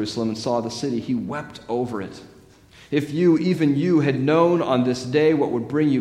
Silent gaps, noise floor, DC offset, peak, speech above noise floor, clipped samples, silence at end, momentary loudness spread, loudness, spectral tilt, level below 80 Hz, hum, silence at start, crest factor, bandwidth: none; -49 dBFS; under 0.1%; -4 dBFS; 29 dB; under 0.1%; 0 s; 10 LU; -21 LUFS; -7 dB/octave; -58 dBFS; none; 0 s; 16 dB; 12 kHz